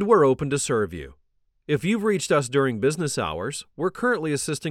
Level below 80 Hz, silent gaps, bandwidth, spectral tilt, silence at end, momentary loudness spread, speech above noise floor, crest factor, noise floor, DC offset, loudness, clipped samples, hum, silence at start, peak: -52 dBFS; none; 14 kHz; -5 dB/octave; 0 s; 10 LU; 31 dB; 18 dB; -54 dBFS; under 0.1%; -24 LUFS; under 0.1%; none; 0 s; -6 dBFS